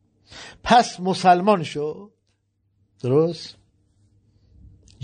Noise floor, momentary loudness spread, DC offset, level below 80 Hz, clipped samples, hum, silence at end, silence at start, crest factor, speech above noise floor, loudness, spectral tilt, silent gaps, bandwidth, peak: -69 dBFS; 23 LU; under 0.1%; -54 dBFS; under 0.1%; none; 1.55 s; 0.35 s; 20 dB; 50 dB; -20 LUFS; -5.5 dB/octave; none; 9.4 kHz; -4 dBFS